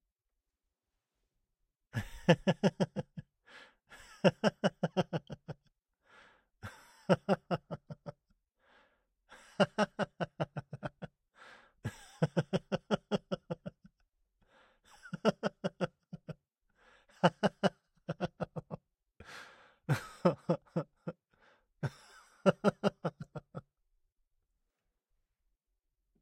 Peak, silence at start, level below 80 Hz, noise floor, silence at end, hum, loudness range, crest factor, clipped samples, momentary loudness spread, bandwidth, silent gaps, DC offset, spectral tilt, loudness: -12 dBFS; 1.95 s; -66 dBFS; -88 dBFS; 2.6 s; none; 4 LU; 26 dB; under 0.1%; 21 LU; 13.5 kHz; none; under 0.1%; -6.5 dB/octave; -35 LUFS